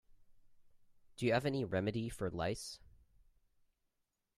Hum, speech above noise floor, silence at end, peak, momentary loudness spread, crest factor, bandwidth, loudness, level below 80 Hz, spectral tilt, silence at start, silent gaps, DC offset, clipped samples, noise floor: none; 48 dB; 1.6 s; -18 dBFS; 11 LU; 24 dB; 14.5 kHz; -38 LUFS; -64 dBFS; -6 dB/octave; 0.1 s; none; under 0.1%; under 0.1%; -86 dBFS